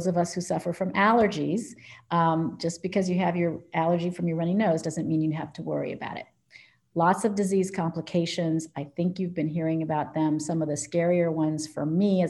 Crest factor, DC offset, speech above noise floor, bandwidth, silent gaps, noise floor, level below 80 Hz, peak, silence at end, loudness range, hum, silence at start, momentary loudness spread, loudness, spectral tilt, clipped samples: 18 dB; under 0.1%; 29 dB; 12 kHz; none; -55 dBFS; -66 dBFS; -8 dBFS; 0 s; 2 LU; none; 0 s; 8 LU; -27 LUFS; -6 dB/octave; under 0.1%